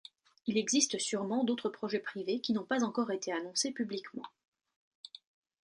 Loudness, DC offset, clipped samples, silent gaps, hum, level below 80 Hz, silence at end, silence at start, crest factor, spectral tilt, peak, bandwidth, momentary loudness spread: -34 LUFS; under 0.1%; under 0.1%; 4.48-4.52 s, 4.76-5.04 s; none; -82 dBFS; 0.55 s; 0.45 s; 20 dB; -3 dB/octave; -14 dBFS; 11.5 kHz; 20 LU